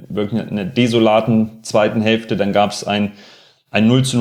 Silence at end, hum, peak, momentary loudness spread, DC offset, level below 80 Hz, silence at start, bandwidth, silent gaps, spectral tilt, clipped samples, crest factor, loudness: 0 s; none; 0 dBFS; 8 LU; under 0.1%; -54 dBFS; 0 s; 13 kHz; none; -5.5 dB/octave; under 0.1%; 16 dB; -16 LUFS